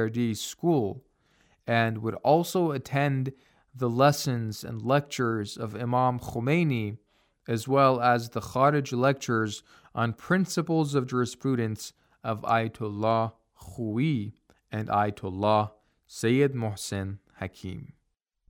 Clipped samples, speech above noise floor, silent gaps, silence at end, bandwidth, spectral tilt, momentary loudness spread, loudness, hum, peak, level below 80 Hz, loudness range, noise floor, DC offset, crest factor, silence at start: under 0.1%; 50 dB; none; 0.65 s; 17.5 kHz; -6 dB/octave; 14 LU; -27 LUFS; none; -8 dBFS; -64 dBFS; 4 LU; -77 dBFS; under 0.1%; 20 dB; 0 s